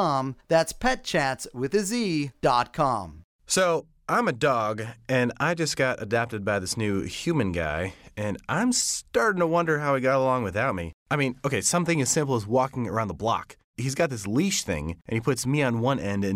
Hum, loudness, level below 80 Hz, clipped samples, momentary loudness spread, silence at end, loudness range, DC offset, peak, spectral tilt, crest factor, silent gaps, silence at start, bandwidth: none; -26 LUFS; -50 dBFS; under 0.1%; 8 LU; 0 s; 2 LU; under 0.1%; -8 dBFS; -4.5 dB/octave; 16 dB; 3.24-3.39 s, 10.94-11.06 s, 13.64-13.74 s; 0 s; 16 kHz